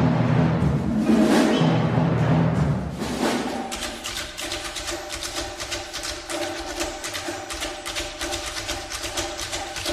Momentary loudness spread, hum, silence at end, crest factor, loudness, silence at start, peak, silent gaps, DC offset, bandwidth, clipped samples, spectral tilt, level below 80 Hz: 10 LU; none; 0 s; 18 dB; -24 LUFS; 0 s; -6 dBFS; none; under 0.1%; 15.5 kHz; under 0.1%; -5 dB/octave; -42 dBFS